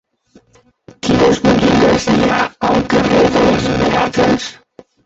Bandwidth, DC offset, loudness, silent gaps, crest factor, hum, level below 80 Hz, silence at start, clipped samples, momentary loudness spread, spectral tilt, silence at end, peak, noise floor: 8.2 kHz; under 0.1%; -13 LUFS; none; 12 dB; none; -36 dBFS; 1.05 s; under 0.1%; 5 LU; -5.5 dB/octave; 0.55 s; 0 dBFS; -52 dBFS